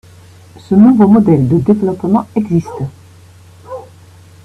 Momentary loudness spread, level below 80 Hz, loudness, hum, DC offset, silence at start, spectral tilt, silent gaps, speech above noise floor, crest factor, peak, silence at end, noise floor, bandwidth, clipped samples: 23 LU; -46 dBFS; -11 LUFS; none; under 0.1%; 0.7 s; -10 dB/octave; none; 29 dB; 12 dB; 0 dBFS; 0.65 s; -40 dBFS; 8 kHz; under 0.1%